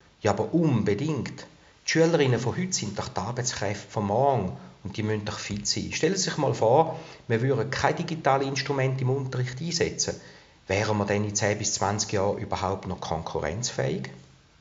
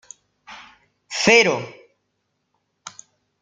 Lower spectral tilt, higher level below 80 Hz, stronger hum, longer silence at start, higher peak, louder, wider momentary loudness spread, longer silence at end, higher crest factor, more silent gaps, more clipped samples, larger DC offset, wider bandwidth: first, -5 dB/octave vs -2.5 dB/octave; first, -56 dBFS vs -62 dBFS; neither; second, 0.25 s vs 0.5 s; second, -6 dBFS vs -2 dBFS; second, -26 LUFS vs -17 LUFS; second, 9 LU vs 28 LU; about the same, 0.4 s vs 0.5 s; about the same, 22 dB vs 22 dB; neither; neither; neither; second, 8 kHz vs 9.4 kHz